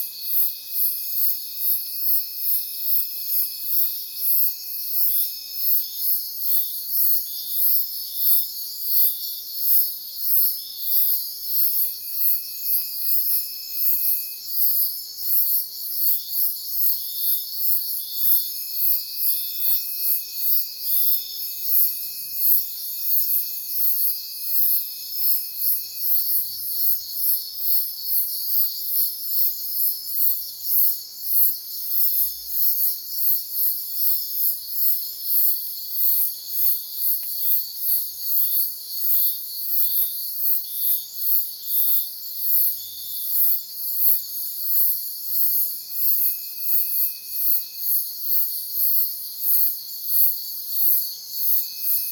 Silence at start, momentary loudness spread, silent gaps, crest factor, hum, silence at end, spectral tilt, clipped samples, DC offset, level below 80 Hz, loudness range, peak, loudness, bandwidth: 0 s; 6 LU; none; 20 dB; none; 0 s; 3 dB/octave; under 0.1%; under 0.1%; -72 dBFS; 1 LU; -2 dBFS; -19 LUFS; 19.5 kHz